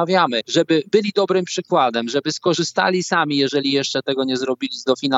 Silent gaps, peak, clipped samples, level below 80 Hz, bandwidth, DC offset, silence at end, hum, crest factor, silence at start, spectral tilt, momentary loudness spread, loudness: none; -2 dBFS; under 0.1%; -70 dBFS; 8 kHz; under 0.1%; 0 s; none; 16 dB; 0 s; -4 dB/octave; 4 LU; -19 LUFS